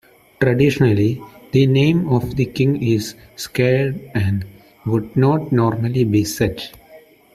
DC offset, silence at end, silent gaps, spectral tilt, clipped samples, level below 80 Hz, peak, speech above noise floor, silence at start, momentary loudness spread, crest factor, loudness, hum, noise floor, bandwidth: under 0.1%; 0.35 s; none; -7 dB/octave; under 0.1%; -46 dBFS; -2 dBFS; 29 dB; 0.4 s; 13 LU; 16 dB; -18 LUFS; none; -46 dBFS; 14.5 kHz